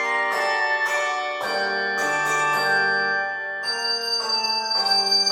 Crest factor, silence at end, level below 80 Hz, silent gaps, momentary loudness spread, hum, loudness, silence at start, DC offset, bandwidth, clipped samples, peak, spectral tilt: 14 dB; 0 s; -78 dBFS; none; 6 LU; none; -21 LUFS; 0 s; under 0.1%; 16.5 kHz; under 0.1%; -8 dBFS; -0.5 dB/octave